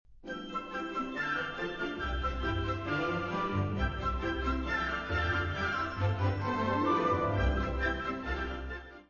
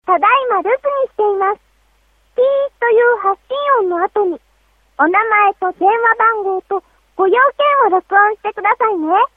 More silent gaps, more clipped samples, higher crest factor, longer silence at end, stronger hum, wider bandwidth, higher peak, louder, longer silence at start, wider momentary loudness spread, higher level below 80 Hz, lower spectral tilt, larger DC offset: neither; neither; about the same, 16 dB vs 14 dB; about the same, 0.05 s vs 0.1 s; neither; first, 7 kHz vs 4 kHz; second, -16 dBFS vs 0 dBFS; second, -33 LUFS vs -14 LUFS; about the same, 0.1 s vs 0.05 s; about the same, 7 LU vs 8 LU; first, -40 dBFS vs -58 dBFS; about the same, -4.5 dB/octave vs -5.5 dB/octave; neither